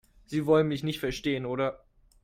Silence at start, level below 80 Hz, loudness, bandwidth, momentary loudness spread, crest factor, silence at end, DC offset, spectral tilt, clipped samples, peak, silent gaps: 0.3 s; -54 dBFS; -29 LUFS; 16 kHz; 8 LU; 18 dB; 0.45 s; under 0.1%; -6.5 dB/octave; under 0.1%; -12 dBFS; none